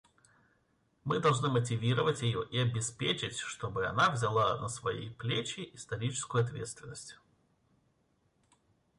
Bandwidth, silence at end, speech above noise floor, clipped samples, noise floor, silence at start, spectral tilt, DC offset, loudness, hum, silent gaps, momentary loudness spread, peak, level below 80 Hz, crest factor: 11.5 kHz; 1.85 s; 41 dB; under 0.1%; -74 dBFS; 1.05 s; -4.5 dB/octave; under 0.1%; -33 LUFS; none; none; 14 LU; -16 dBFS; -64 dBFS; 18 dB